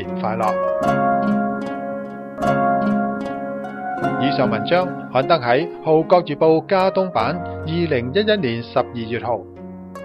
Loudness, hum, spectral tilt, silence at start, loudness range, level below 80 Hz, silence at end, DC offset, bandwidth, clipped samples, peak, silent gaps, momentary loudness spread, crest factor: -20 LUFS; none; -7.5 dB/octave; 0 s; 4 LU; -52 dBFS; 0 s; under 0.1%; 12.5 kHz; under 0.1%; 0 dBFS; none; 11 LU; 18 dB